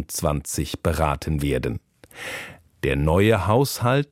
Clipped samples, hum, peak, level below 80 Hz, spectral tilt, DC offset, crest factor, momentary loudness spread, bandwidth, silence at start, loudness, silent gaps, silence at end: under 0.1%; none; -4 dBFS; -36 dBFS; -5.5 dB/octave; under 0.1%; 18 dB; 15 LU; 16.5 kHz; 0 s; -23 LUFS; none; 0.05 s